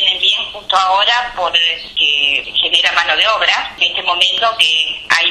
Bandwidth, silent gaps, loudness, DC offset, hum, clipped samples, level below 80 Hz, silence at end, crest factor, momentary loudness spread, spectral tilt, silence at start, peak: 14.5 kHz; none; -12 LUFS; under 0.1%; none; under 0.1%; -48 dBFS; 0 s; 14 dB; 4 LU; 0.5 dB/octave; 0 s; 0 dBFS